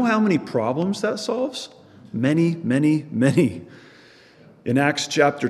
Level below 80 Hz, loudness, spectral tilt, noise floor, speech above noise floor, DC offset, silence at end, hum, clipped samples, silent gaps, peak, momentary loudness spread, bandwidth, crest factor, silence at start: -66 dBFS; -21 LUFS; -6 dB/octave; -50 dBFS; 29 dB; under 0.1%; 0 s; none; under 0.1%; none; -4 dBFS; 14 LU; 12.5 kHz; 18 dB; 0 s